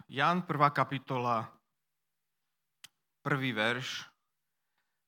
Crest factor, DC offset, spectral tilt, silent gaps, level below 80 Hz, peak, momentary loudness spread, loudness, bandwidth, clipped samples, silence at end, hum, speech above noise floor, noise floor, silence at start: 24 dB; under 0.1%; -5.5 dB/octave; none; -84 dBFS; -12 dBFS; 13 LU; -32 LUFS; 17 kHz; under 0.1%; 1 s; none; 56 dB; -88 dBFS; 0.1 s